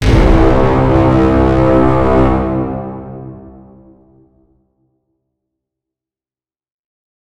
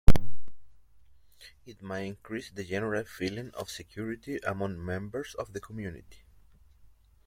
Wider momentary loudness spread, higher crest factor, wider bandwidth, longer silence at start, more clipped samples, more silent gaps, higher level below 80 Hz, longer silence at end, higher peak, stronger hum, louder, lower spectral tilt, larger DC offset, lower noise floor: about the same, 17 LU vs 17 LU; second, 14 dB vs 24 dB; second, 10 kHz vs 15.5 kHz; about the same, 0 s vs 0.05 s; neither; neither; first, -20 dBFS vs -36 dBFS; first, 3.6 s vs 1.3 s; about the same, 0 dBFS vs -2 dBFS; neither; first, -11 LUFS vs -36 LUFS; first, -8.5 dB/octave vs -6 dB/octave; neither; first, under -90 dBFS vs -63 dBFS